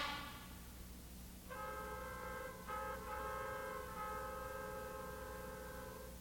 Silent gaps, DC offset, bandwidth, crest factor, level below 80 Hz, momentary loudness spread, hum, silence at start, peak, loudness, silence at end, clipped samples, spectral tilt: none; under 0.1%; 19 kHz; 18 dB; -58 dBFS; 9 LU; none; 0 s; -30 dBFS; -48 LUFS; 0 s; under 0.1%; -4 dB/octave